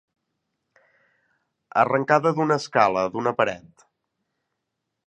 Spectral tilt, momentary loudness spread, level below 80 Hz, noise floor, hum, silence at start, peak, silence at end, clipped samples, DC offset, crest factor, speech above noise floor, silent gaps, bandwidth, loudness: -6 dB/octave; 6 LU; -66 dBFS; -81 dBFS; none; 1.75 s; -2 dBFS; 1.5 s; under 0.1%; under 0.1%; 24 dB; 59 dB; none; 9.8 kHz; -22 LUFS